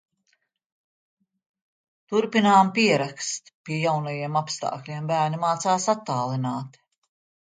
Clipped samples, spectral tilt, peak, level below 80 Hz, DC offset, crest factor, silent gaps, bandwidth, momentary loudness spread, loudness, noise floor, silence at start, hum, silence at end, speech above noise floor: under 0.1%; -4.5 dB/octave; -6 dBFS; -72 dBFS; under 0.1%; 20 dB; 3.54-3.64 s; 9.6 kHz; 13 LU; -24 LUFS; -72 dBFS; 2.1 s; none; 0.75 s; 48 dB